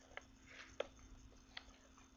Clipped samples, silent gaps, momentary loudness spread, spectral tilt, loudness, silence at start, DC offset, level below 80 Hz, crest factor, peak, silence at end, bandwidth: under 0.1%; none; 14 LU; -2 dB/octave; -55 LUFS; 0 s; under 0.1%; -66 dBFS; 28 dB; -28 dBFS; 0 s; 7.2 kHz